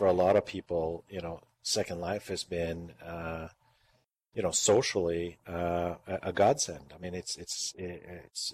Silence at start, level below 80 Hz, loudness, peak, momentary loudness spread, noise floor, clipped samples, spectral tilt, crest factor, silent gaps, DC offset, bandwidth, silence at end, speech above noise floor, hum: 0 s; -62 dBFS; -32 LUFS; -14 dBFS; 16 LU; -72 dBFS; under 0.1%; -3.5 dB/octave; 18 dB; none; under 0.1%; 14 kHz; 0 s; 40 dB; none